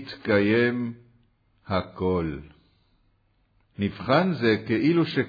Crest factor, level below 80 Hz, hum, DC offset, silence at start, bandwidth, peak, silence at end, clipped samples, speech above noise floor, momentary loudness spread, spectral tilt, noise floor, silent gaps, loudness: 18 dB; -54 dBFS; none; under 0.1%; 0 s; 5 kHz; -8 dBFS; 0 s; under 0.1%; 43 dB; 10 LU; -8.5 dB/octave; -66 dBFS; none; -24 LUFS